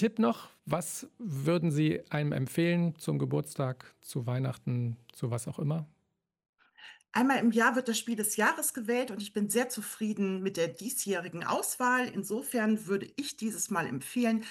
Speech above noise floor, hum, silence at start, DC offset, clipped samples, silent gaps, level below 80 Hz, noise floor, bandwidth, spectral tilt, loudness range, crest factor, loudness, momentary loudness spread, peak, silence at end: 49 dB; none; 0 s; under 0.1%; under 0.1%; 6.49-6.53 s; -72 dBFS; -79 dBFS; 16.5 kHz; -5 dB/octave; 5 LU; 18 dB; -31 LUFS; 9 LU; -14 dBFS; 0 s